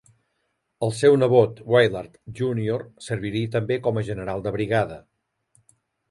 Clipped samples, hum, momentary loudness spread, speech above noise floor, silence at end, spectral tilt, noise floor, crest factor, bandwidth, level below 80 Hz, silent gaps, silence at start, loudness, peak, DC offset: under 0.1%; none; 13 LU; 52 dB; 1.1 s; -6.5 dB/octave; -74 dBFS; 20 dB; 11.5 kHz; -54 dBFS; none; 0.8 s; -23 LUFS; -4 dBFS; under 0.1%